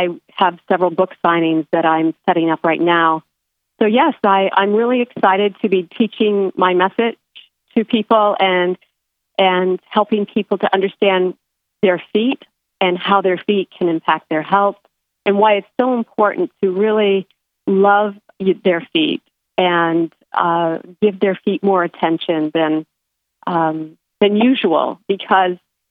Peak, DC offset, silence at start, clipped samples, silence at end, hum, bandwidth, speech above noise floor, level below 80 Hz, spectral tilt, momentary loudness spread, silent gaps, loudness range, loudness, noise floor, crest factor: 0 dBFS; under 0.1%; 0 s; under 0.1%; 0.35 s; none; 4.6 kHz; 60 dB; -70 dBFS; -9 dB/octave; 7 LU; none; 2 LU; -16 LUFS; -75 dBFS; 16 dB